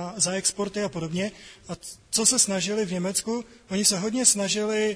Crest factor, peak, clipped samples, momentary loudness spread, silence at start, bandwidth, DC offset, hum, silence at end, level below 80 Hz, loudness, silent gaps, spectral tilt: 22 dB; -4 dBFS; under 0.1%; 13 LU; 0 s; 11 kHz; under 0.1%; none; 0 s; -60 dBFS; -23 LUFS; none; -2.5 dB/octave